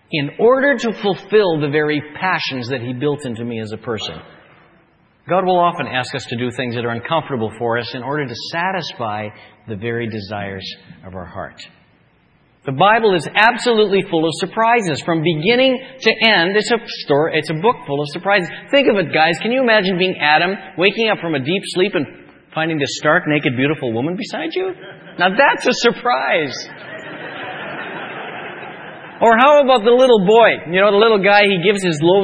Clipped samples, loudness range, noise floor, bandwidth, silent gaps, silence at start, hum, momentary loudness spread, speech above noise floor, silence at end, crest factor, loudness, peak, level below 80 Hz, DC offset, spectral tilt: under 0.1%; 9 LU; -55 dBFS; 10 kHz; none; 0.1 s; none; 17 LU; 39 dB; 0 s; 16 dB; -16 LUFS; 0 dBFS; -58 dBFS; under 0.1%; -5 dB/octave